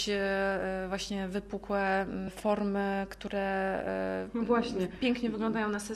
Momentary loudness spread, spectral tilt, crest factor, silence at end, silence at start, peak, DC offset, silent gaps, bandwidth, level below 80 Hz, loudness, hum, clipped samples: 6 LU; -5 dB/octave; 16 dB; 0 s; 0 s; -16 dBFS; under 0.1%; none; 13.5 kHz; -54 dBFS; -32 LUFS; none; under 0.1%